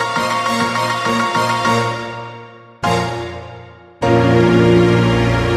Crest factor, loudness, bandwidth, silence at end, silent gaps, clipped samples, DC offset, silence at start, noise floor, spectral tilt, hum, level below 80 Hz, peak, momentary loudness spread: 14 dB; -15 LUFS; 13.5 kHz; 0 s; none; under 0.1%; under 0.1%; 0 s; -37 dBFS; -6 dB/octave; none; -36 dBFS; 0 dBFS; 17 LU